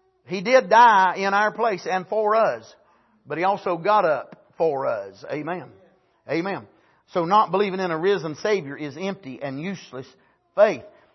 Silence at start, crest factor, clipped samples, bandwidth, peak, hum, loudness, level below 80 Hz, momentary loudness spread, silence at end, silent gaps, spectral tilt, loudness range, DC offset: 0.3 s; 20 dB; under 0.1%; 6.2 kHz; -4 dBFS; none; -22 LUFS; -74 dBFS; 15 LU; 0.25 s; none; -5.5 dB/octave; 6 LU; under 0.1%